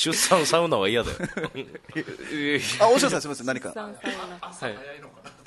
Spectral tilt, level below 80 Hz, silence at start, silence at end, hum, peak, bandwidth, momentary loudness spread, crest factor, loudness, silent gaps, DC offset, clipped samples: -3 dB/octave; -54 dBFS; 0 s; 0.15 s; none; -4 dBFS; 12.5 kHz; 16 LU; 20 dB; -24 LUFS; none; under 0.1%; under 0.1%